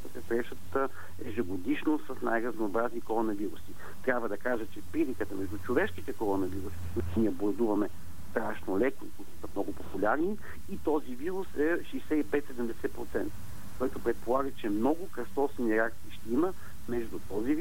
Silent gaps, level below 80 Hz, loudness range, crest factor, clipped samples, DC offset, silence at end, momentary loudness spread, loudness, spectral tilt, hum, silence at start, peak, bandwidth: none; -54 dBFS; 2 LU; 18 dB; under 0.1%; 2%; 0 s; 8 LU; -33 LUFS; -6.5 dB/octave; none; 0 s; -12 dBFS; 16 kHz